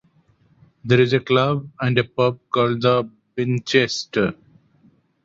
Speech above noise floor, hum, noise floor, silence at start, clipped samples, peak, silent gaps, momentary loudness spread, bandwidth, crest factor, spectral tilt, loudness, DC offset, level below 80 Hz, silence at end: 39 dB; none; -59 dBFS; 0.85 s; under 0.1%; -2 dBFS; none; 7 LU; 7.8 kHz; 20 dB; -6 dB/octave; -20 LUFS; under 0.1%; -56 dBFS; 0.9 s